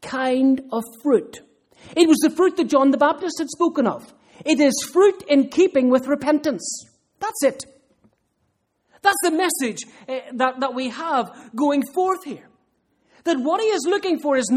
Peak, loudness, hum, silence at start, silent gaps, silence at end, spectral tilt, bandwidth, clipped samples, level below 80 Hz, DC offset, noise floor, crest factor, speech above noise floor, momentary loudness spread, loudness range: -2 dBFS; -20 LUFS; none; 0 s; none; 0 s; -3.5 dB/octave; 16 kHz; under 0.1%; -66 dBFS; under 0.1%; -70 dBFS; 18 dB; 50 dB; 14 LU; 5 LU